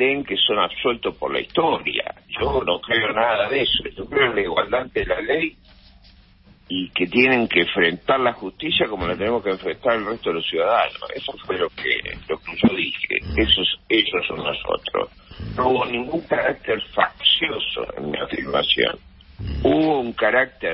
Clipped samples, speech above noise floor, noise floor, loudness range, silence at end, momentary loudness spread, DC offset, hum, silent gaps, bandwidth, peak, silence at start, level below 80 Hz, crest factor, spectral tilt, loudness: under 0.1%; 29 dB; -51 dBFS; 3 LU; 0 s; 10 LU; under 0.1%; none; none; 5.8 kHz; 0 dBFS; 0 s; -42 dBFS; 20 dB; -9.5 dB/octave; -21 LUFS